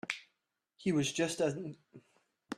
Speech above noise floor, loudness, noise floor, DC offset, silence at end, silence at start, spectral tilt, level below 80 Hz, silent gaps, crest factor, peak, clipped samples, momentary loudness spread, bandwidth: 49 dB; -35 LUFS; -83 dBFS; under 0.1%; 0 s; 0.05 s; -4.5 dB/octave; -72 dBFS; none; 22 dB; -16 dBFS; under 0.1%; 13 LU; 13 kHz